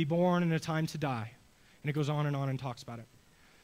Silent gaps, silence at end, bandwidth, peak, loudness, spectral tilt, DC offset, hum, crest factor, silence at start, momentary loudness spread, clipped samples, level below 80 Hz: none; 0.6 s; 15.5 kHz; -18 dBFS; -33 LUFS; -7 dB/octave; under 0.1%; none; 16 dB; 0 s; 17 LU; under 0.1%; -66 dBFS